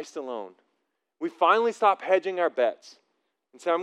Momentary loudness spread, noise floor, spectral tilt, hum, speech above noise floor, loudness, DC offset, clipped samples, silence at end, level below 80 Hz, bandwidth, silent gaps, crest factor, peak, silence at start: 15 LU; -78 dBFS; -3.5 dB/octave; none; 53 dB; -25 LUFS; under 0.1%; under 0.1%; 0 s; under -90 dBFS; 10.5 kHz; none; 20 dB; -6 dBFS; 0 s